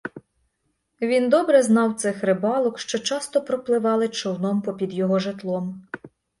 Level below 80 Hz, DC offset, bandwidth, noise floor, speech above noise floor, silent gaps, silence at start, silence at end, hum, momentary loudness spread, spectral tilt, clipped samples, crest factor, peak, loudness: -68 dBFS; under 0.1%; 11.5 kHz; -73 dBFS; 52 dB; none; 0.05 s; 0.35 s; none; 12 LU; -5 dB/octave; under 0.1%; 18 dB; -4 dBFS; -22 LUFS